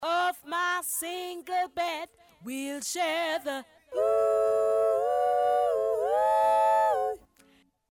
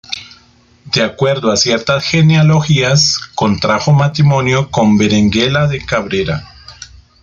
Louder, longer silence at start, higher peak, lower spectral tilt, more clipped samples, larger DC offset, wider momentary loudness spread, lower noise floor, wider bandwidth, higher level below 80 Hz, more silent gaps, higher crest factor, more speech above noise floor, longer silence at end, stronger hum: second, -27 LUFS vs -12 LUFS; about the same, 0 s vs 0.1 s; second, -16 dBFS vs 0 dBFS; second, -1.5 dB/octave vs -5 dB/octave; neither; neither; first, 13 LU vs 7 LU; first, -63 dBFS vs -47 dBFS; first, 19 kHz vs 7.6 kHz; second, -68 dBFS vs -42 dBFS; neither; about the same, 12 dB vs 12 dB; second, 31 dB vs 36 dB; first, 0.75 s vs 0.4 s; neither